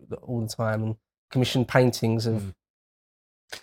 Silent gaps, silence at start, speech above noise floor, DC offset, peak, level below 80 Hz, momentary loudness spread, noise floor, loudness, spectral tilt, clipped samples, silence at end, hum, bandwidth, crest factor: 1.18-1.28 s, 2.70-3.48 s; 0.1 s; over 65 dB; under 0.1%; -4 dBFS; -58 dBFS; 15 LU; under -90 dBFS; -26 LUFS; -6 dB/octave; under 0.1%; 0.05 s; none; 16.5 kHz; 24 dB